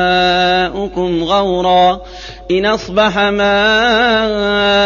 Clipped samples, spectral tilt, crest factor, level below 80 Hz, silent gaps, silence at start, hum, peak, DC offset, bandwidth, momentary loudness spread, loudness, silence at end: under 0.1%; -4.5 dB/octave; 12 dB; -36 dBFS; none; 0 s; none; -2 dBFS; under 0.1%; 7.2 kHz; 8 LU; -12 LUFS; 0 s